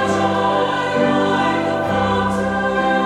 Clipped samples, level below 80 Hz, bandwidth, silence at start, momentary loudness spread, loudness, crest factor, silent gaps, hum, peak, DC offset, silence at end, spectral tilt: under 0.1%; -44 dBFS; 12.5 kHz; 0 s; 3 LU; -18 LUFS; 12 dB; none; none; -4 dBFS; under 0.1%; 0 s; -5.5 dB/octave